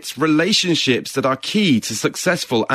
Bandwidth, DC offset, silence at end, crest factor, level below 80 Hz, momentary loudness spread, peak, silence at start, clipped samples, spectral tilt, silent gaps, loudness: 14.5 kHz; under 0.1%; 0 s; 14 dB; -60 dBFS; 5 LU; -4 dBFS; 0 s; under 0.1%; -4 dB/octave; none; -17 LUFS